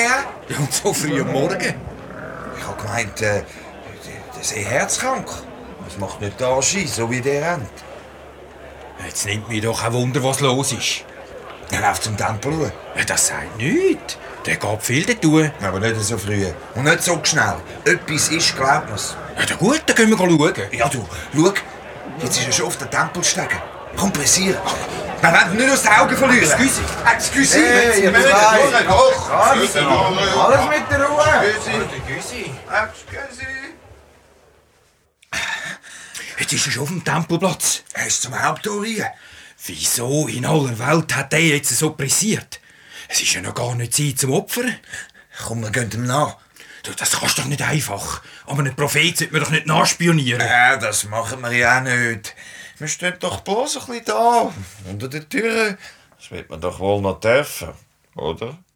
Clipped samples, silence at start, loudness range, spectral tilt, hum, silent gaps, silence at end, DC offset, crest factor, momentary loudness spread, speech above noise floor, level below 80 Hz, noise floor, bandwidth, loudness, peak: under 0.1%; 0 s; 10 LU; -3.5 dB/octave; none; none; 0.2 s; under 0.1%; 20 dB; 18 LU; 40 dB; -46 dBFS; -58 dBFS; over 20 kHz; -18 LUFS; 0 dBFS